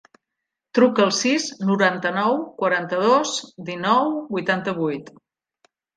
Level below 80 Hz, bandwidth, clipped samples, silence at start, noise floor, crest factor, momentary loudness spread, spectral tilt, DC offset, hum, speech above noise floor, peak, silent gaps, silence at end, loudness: -70 dBFS; 10 kHz; under 0.1%; 0.75 s; -83 dBFS; 20 dB; 8 LU; -4 dB/octave; under 0.1%; none; 62 dB; -2 dBFS; none; 0.9 s; -21 LUFS